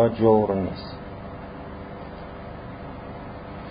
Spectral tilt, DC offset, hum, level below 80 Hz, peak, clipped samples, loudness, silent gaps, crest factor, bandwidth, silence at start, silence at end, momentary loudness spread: -12 dB/octave; under 0.1%; 50 Hz at -45 dBFS; -46 dBFS; -6 dBFS; under 0.1%; -26 LUFS; none; 20 dB; 5.2 kHz; 0 s; 0 s; 19 LU